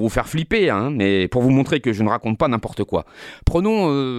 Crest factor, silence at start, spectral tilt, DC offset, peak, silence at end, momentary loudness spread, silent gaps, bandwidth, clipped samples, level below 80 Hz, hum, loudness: 14 dB; 0 s; -7 dB/octave; under 0.1%; -4 dBFS; 0 s; 7 LU; none; 14 kHz; under 0.1%; -34 dBFS; none; -19 LUFS